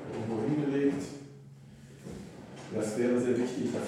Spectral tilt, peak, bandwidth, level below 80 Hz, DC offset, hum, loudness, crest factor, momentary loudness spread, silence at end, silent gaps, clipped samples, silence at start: -6.5 dB/octave; -16 dBFS; 13.5 kHz; -64 dBFS; under 0.1%; none; -31 LUFS; 16 dB; 22 LU; 0 s; none; under 0.1%; 0 s